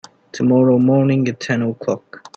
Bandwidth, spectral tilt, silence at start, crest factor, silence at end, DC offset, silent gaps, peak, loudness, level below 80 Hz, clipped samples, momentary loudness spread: 7.4 kHz; -7.5 dB/octave; 0.35 s; 14 dB; 0.2 s; under 0.1%; none; -4 dBFS; -16 LUFS; -58 dBFS; under 0.1%; 11 LU